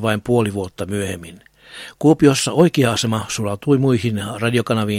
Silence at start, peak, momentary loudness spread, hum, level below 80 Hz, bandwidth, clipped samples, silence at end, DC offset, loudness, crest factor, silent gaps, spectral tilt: 0 s; 0 dBFS; 12 LU; none; -50 dBFS; 16 kHz; under 0.1%; 0 s; under 0.1%; -18 LUFS; 18 dB; none; -5.5 dB/octave